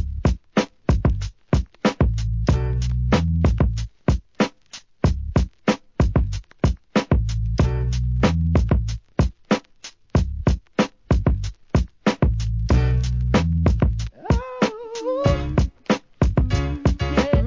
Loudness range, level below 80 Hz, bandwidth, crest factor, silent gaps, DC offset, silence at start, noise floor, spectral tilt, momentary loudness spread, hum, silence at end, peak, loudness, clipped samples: 2 LU; -24 dBFS; 7.6 kHz; 18 dB; none; 0.1%; 0 s; -45 dBFS; -7 dB/octave; 5 LU; none; 0 s; -4 dBFS; -22 LUFS; under 0.1%